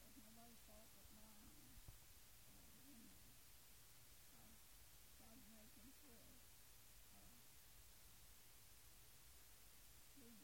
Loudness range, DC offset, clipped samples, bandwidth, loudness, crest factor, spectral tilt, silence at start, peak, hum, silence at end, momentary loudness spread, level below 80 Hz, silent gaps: 1 LU; under 0.1%; under 0.1%; 16.5 kHz; -65 LUFS; 18 dB; -2.5 dB/octave; 0 s; -48 dBFS; none; 0 s; 1 LU; -74 dBFS; none